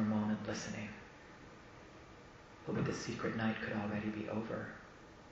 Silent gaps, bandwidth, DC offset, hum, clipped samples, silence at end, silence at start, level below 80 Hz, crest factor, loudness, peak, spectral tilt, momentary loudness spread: none; 8 kHz; under 0.1%; none; under 0.1%; 0 s; 0 s; -66 dBFS; 18 dB; -40 LUFS; -24 dBFS; -5.5 dB/octave; 19 LU